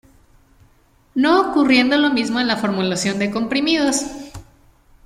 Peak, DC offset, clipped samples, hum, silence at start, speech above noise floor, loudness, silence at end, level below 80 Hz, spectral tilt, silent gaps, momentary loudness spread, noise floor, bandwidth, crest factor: -2 dBFS; under 0.1%; under 0.1%; none; 1.15 s; 38 dB; -17 LUFS; 0.65 s; -52 dBFS; -3.5 dB/octave; none; 11 LU; -55 dBFS; 14.5 kHz; 16 dB